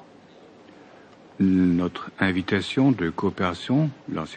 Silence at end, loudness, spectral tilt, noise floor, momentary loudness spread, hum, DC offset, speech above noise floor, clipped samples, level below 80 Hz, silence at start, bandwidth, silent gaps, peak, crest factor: 0 s; -23 LUFS; -7 dB/octave; -50 dBFS; 7 LU; none; under 0.1%; 27 dB; under 0.1%; -62 dBFS; 0 s; 9.2 kHz; none; -8 dBFS; 18 dB